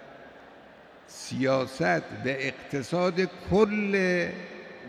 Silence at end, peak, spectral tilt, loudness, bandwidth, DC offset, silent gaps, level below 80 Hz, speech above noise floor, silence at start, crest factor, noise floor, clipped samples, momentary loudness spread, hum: 0 s; -10 dBFS; -6 dB/octave; -27 LUFS; 14 kHz; under 0.1%; none; -58 dBFS; 24 dB; 0 s; 18 dB; -51 dBFS; under 0.1%; 17 LU; none